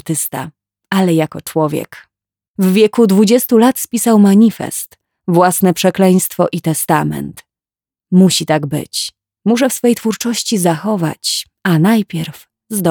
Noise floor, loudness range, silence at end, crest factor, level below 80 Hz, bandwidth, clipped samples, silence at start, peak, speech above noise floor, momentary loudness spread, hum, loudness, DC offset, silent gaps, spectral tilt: under -90 dBFS; 4 LU; 0 s; 14 dB; -56 dBFS; 20 kHz; under 0.1%; 0.05 s; 0 dBFS; over 77 dB; 13 LU; none; -13 LUFS; under 0.1%; 2.48-2.54 s; -5 dB/octave